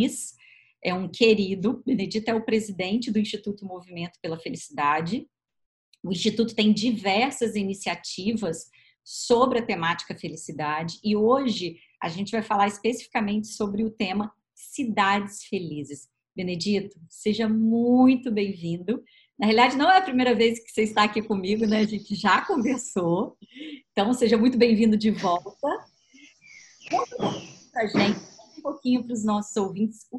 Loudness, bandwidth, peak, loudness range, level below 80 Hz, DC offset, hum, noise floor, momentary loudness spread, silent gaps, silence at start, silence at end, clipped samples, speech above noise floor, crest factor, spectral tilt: -25 LUFS; 12 kHz; -6 dBFS; 6 LU; -62 dBFS; under 0.1%; none; -55 dBFS; 15 LU; 5.66-5.92 s; 0 s; 0 s; under 0.1%; 30 dB; 20 dB; -5 dB/octave